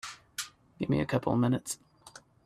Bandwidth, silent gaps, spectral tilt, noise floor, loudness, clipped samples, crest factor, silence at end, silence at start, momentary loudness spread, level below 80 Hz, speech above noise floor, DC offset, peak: 14 kHz; none; -5.5 dB/octave; -55 dBFS; -32 LUFS; under 0.1%; 20 dB; 0.25 s; 0.05 s; 24 LU; -60 dBFS; 26 dB; under 0.1%; -14 dBFS